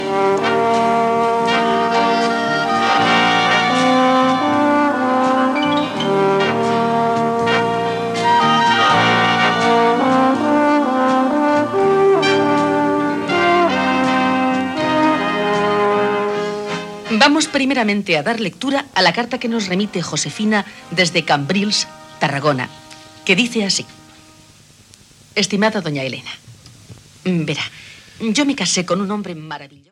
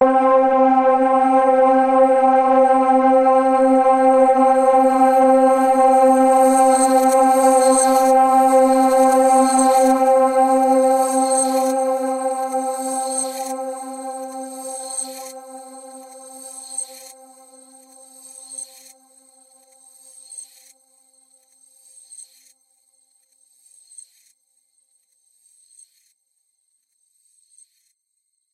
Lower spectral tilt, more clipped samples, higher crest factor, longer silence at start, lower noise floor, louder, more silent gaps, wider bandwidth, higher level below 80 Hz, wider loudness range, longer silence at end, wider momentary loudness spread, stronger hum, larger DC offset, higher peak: first, -4 dB/octave vs -2.5 dB/octave; neither; about the same, 16 dB vs 14 dB; about the same, 0 s vs 0 s; second, -46 dBFS vs -73 dBFS; about the same, -16 LUFS vs -15 LUFS; neither; second, 13.5 kHz vs 15.5 kHz; about the same, -58 dBFS vs -60 dBFS; second, 7 LU vs 20 LU; second, 0.25 s vs 6.3 s; second, 9 LU vs 19 LU; neither; neither; first, 0 dBFS vs -4 dBFS